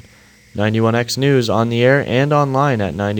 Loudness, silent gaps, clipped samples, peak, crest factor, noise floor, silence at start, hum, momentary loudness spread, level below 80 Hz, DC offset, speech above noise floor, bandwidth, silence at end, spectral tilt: -16 LUFS; none; under 0.1%; 0 dBFS; 16 dB; -47 dBFS; 0.55 s; none; 5 LU; -50 dBFS; under 0.1%; 32 dB; 19 kHz; 0 s; -6 dB/octave